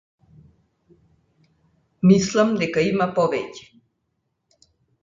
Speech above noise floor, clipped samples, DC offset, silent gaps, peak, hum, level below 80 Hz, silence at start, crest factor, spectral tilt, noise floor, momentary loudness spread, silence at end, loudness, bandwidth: 55 dB; under 0.1%; under 0.1%; none; -2 dBFS; none; -58 dBFS; 2.05 s; 22 dB; -6 dB/octave; -74 dBFS; 13 LU; 1.45 s; -20 LUFS; 7.6 kHz